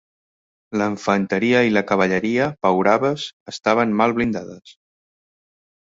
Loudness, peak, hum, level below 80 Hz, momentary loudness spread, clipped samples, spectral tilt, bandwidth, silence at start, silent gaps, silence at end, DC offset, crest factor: -19 LUFS; -2 dBFS; none; -56 dBFS; 11 LU; under 0.1%; -6 dB/octave; 7.8 kHz; 0.7 s; 3.33-3.46 s; 1.15 s; under 0.1%; 18 dB